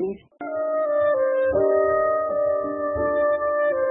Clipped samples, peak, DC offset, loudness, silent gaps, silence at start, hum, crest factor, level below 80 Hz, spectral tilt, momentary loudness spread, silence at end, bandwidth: under 0.1%; -10 dBFS; under 0.1%; -22 LUFS; none; 0 s; none; 12 dB; -52 dBFS; -11 dB/octave; 7 LU; 0 s; 3.8 kHz